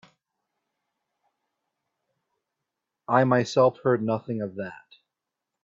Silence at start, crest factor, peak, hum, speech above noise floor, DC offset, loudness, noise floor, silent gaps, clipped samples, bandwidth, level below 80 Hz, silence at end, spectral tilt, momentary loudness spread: 3.1 s; 24 dB; -6 dBFS; none; 62 dB; under 0.1%; -24 LUFS; -86 dBFS; none; under 0.1%; 7.8 kHz; -70 dBFS; 0.9 s; -6.5 dB/octave; 16 LU